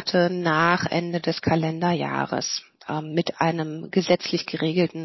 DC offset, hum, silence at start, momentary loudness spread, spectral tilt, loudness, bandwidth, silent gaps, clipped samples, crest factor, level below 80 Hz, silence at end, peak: under 0.1%; none; 0 s; 7 LU; -5 dB/octave; -24 LUFS; 6.2 kHz; none; under 0.1%; 20 dB; -58 dBFS; 0 s; -4 dBFS